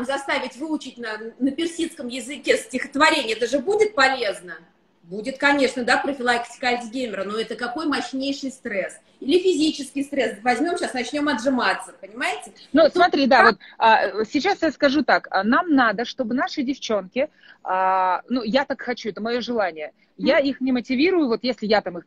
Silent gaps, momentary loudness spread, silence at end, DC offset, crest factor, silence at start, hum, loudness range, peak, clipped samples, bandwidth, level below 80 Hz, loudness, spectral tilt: none; 11 LU; 0.05 s; under 0.1%; 22 dB; 0 s; none; 6 LU; 0 dBFS; under 0.1%; 12.5 kHz; -60 dBFS; -21 LUFS; -3.5 dB/octave